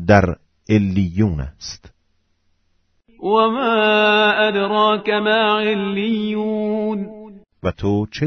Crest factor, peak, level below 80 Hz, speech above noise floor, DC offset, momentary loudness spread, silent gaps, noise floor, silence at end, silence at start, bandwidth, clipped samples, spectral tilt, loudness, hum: 18 dB; 0 dBFS; -42 dBFS; 47 dB; under 0.1%; 14 LU; none; -64 dBFS; 0 s; 0 s; 6.6 kHz; under 0.1%; -6.5 dB/octave; -18 LUFS; none